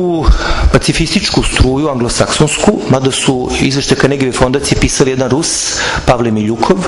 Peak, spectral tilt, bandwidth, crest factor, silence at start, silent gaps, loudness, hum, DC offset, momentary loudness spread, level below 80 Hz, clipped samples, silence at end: 0 dBFS; -4.5 dB/octave; 12 kHz; 12 dB; 0 s; none; -12 LUFS; none; under 0.1%; 2 LU; -20 dBFS; 0.2%; 0 s